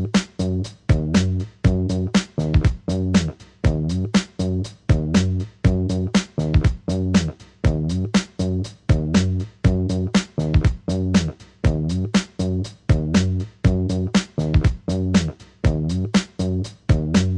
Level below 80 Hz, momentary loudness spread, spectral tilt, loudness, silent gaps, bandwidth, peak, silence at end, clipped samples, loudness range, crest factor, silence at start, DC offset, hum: -30 dBFS; 6 LU; -6.5 dB/octave; -21 LUFS; none; 11 kHz; -4 dBFS; 0 s; under 0.1%; 1 LU; 16 dB; 0 s; under 0.1%; none